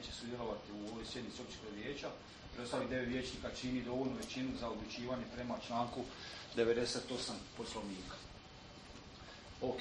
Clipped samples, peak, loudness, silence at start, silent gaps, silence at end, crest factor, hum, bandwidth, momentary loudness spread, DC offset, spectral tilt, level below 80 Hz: under 0.1%; -22 dBFS; -42 LUFS; 0 s; none; 0 s; 22 dB; none; 9.4 kHz; 15 LU; under 0.1%; -4.5 dB/octave; -60 dBFS